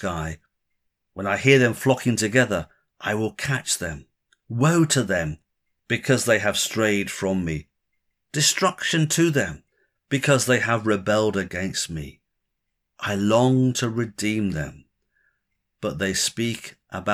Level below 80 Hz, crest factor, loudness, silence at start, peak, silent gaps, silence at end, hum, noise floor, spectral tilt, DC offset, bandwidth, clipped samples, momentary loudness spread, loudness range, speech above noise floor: -50 dBFS; 20 dB; -22 LUFS; 0 s; -4 dBFS; none; 0 s; none; -79 dBFS; -4 dB/octave; under 0.1%; 16 kHz; under 0.1%; 14 LU; 3 LU; 57 dB